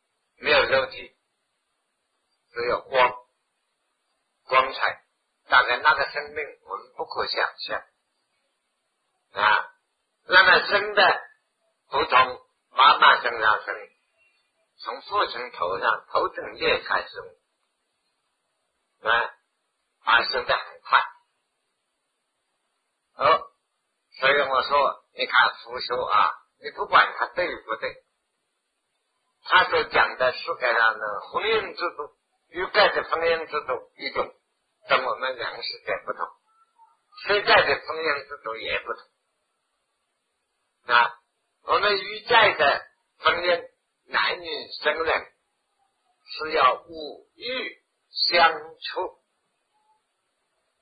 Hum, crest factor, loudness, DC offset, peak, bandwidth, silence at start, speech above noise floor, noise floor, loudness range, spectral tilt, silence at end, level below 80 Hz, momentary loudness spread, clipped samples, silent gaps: none; 24 dB; -22 LUFS; under 0.1%; 0 dBFS; 5 kHz; 0.4 s; 54 dB; -77 dBFS; 7 LU; -5 dB/octave; 1.7 s; -60 dBFS; 17 LU; under 0.1%; none